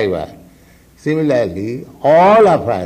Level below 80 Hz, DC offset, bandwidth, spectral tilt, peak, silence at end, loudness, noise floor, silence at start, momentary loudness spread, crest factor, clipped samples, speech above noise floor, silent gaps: -50 dBFS; under 0.1%; 14.5 kHz; -7 dB/octave; -2 dBFS; 0 s; -13 LUFS; -46 dBFS; 0 s; 16 LU; 12 dB; under 0.1%; 33 dB; none